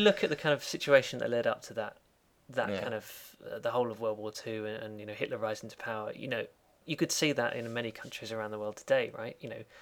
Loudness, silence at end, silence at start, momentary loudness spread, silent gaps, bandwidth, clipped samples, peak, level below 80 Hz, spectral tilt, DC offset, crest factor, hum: -33 LUFS; 0 s; 0 s; 14 LU; none; 18.5 kHz; under 0.1%; -10 dBFS; -72 dBFS; -4 dB/octave; under 0.1%; 22 dB; none